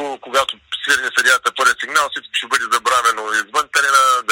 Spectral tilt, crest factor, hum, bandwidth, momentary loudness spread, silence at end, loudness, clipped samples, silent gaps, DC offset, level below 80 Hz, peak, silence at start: 1 dB/octave; 18 dB; none; 16.5 kHz; 7 LU; 0 s; -16 LUFS; under 0.1%; none; under 0.1%; -60 dBFS; 0 dBFS; 0 s